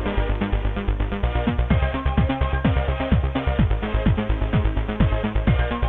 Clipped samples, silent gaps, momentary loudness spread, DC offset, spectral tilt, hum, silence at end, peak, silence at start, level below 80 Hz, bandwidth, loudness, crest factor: under 0.1%; none; 3 LU; under 0.1%; -10 dB/octave; none; 0 s; -6 dBFS; 0 s; -24 dBFS; 4 kHz; -23 LUFS; 14 dB